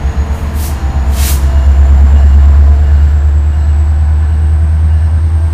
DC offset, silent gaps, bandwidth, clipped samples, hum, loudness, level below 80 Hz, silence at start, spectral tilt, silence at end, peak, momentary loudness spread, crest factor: under 0.1%; none; 15.5 kHz; 0.9%; none; -9 LUFS; -8 dBFS; 0 s; -6.5 dB/octave; 0 s; 0 dBFS; 8 LU; 6 dB